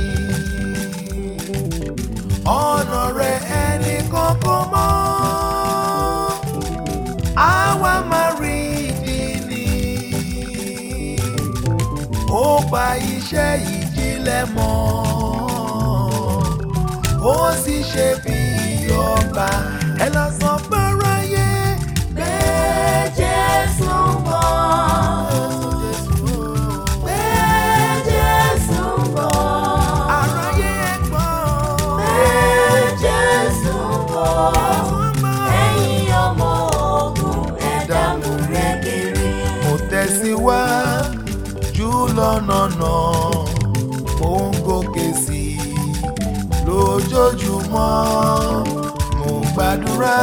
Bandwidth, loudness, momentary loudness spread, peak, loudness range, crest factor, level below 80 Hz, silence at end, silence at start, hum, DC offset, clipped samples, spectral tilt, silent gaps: over 20 kHz; -18 LUFS; 7 LU; 0 dBFS; 4 LU; 16 dB; -28 dBFS; 0 s; 0 s; none; 0.2%; under 0.1%; -5 dB/octave; none